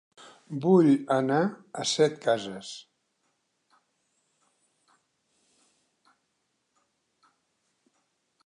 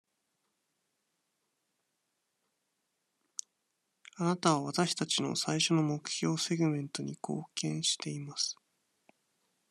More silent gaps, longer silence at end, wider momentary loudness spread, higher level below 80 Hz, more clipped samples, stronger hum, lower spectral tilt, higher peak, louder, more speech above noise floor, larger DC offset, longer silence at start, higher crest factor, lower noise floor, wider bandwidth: neither; first, 5.65 s vs 1.2 s; first, 19 LU vs 11 LU; about the same, -80 dBFS vs -80 dBFS; neither; neither; first, -5.5 dB/octave vs -4 dB/octave; first, -8 dBFS vs -12 dBFS; first, -25 LUFS vs -32 LUFS; about the same, 52 dB vs 50 dB; neither; second, 0.5 s vs 4.15 s; about the same, 22 dB vs 24 dB; second, -77 dBFS vs -82 dBFS; second, 11 kHz vs 13 kHz